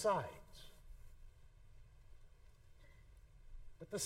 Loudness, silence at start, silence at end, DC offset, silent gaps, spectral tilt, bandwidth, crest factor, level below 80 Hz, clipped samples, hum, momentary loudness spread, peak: -46 LUFS; 0 s; 0 s; under 0.1%; none; -3.5 dB/octave; 16 kHz; 22 dB; -60 dBFS; under 0.1%; none; 21 LU; -24 dBFS